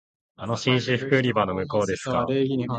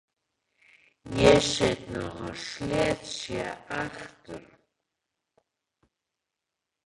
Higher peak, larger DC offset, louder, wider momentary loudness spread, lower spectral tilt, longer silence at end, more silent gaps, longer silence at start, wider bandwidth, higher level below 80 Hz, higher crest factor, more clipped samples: about the same, -6 dBFS vs -6 dBFS; neither; first, -24 LUFS vs -27 LUFS; second, 5 LU vs 23 LU; first, -6 dB/octave vs -4.5 dB/octave; second, 0 s vs 2.45 s; neither; second, 0.4 s vs 1.05 s; second, 9.2 kHz vs 11.5 kHz; about the same, -54 dBFS vs -50 dBFS; about the same, 20 dB vs 24 dB; neither